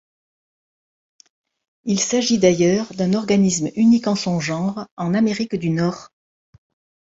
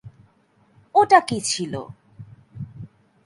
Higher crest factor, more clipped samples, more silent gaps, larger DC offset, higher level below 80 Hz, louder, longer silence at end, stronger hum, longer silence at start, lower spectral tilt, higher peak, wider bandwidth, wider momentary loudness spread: second, 18 dB vs 24 dB; neither; first, 4.91-4.97 s vs none; neither; about the same, -58 dBFS vs -60 dBFS; about the same, -19 LUFS vs -19 LUFS; first, 0.95 s vs 0.4 s; neither; first, 1.85 s vs 0.05 s; first, -5 dB/octave vs -3.5 dB/octave; about the same, -2 dBFS vs 0 dBFS; second, 8 kHz vs 11.5 kHz; second, 9 LU vs 24 LU